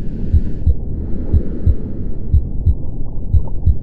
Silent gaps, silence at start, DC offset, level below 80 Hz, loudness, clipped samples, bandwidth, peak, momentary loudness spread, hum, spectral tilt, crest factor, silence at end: none; 0 s; under 0.1%; -18 dBFS; -20 LUFS; under 0.1%; 1.9 kHz; 0 dBFS; 9 LU; none; -12 dB/octave; 14 dB; 0 s